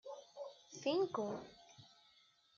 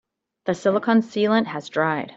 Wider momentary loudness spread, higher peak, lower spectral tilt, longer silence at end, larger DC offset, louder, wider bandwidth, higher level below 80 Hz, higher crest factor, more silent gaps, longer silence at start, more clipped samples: first, 24 LU vs 8 LU; second, -24 dBFS vs -6 dBFS; second, -4 dB/octave vs -6 dB/octave; first, 0.7 s vs 0.05 s; neither; second, -42 LUFS vs -22 LUFS; about the same, 7.4 kHz vs 7.8 kHz; second, -84 dBFS vs -66 dBFS; about the same, 20 dB vs 18 dB; neither; second, 0.05 s vs 0.45 s; neither